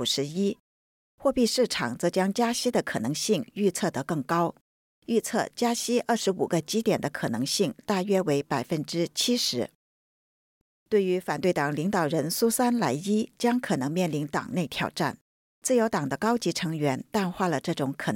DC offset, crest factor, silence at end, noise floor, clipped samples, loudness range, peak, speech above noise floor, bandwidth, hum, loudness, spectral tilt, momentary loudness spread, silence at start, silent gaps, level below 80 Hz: under 0.1%; 14 dB; 0 s; under -90 dBFS; under 0.1%; 2 LU; -12 dBFS; over 64 dB; 17 kHz; none; -27 LUFS; -4.5 dB/octave; 6 LU; 0 s; 0.60-1.18 s, 4.61-5.02 s, 9.75-10.86 s, 15.21-15.62 s; -64 dBFS